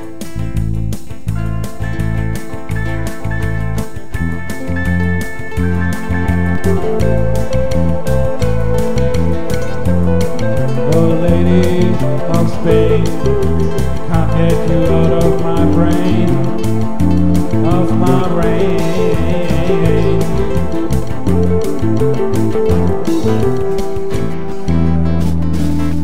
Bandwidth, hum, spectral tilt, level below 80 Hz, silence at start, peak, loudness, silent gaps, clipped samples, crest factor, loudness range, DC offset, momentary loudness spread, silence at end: 16 kHz; none; -7.5 dB/octave; -24 dBFS; 0 s; 0 dBFS; -15 LUFS; none; under 0.1%; 14 dB; 6 LU; 20%; 9 LU; 0 s